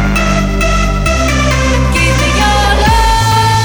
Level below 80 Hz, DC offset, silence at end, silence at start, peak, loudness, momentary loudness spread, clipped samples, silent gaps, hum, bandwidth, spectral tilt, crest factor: -14 dBFS; under 0.1%; 0 s; 0 s; 0 dBFS; -11 LUFS; 3 LU; under 0.1%; none; none; over 20 kHz; -4.5 dB/octave; 10 dB